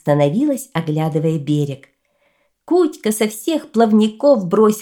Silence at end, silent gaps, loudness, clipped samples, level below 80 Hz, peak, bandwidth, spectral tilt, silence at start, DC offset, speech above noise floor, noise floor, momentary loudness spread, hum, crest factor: 0 s; none; -17 LUFS; under 0.1%; -64 dBFS; -2 dBFS; 18 kHz; -6.5 dB/octave; 0.05 s; under 0.1%; 47 dB; -63 dBFS; 7 LU; none; 16 dB